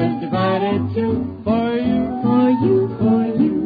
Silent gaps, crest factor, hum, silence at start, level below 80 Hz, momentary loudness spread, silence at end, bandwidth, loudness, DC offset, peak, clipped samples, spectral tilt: none; 12 dB; none; 0 s; -48 dBFS; 5 LU; 0 s; 4.9 kHz; -18 LUFS; under 0.1%; -4 dBFS; under 0.1%; -10.5 dB/octave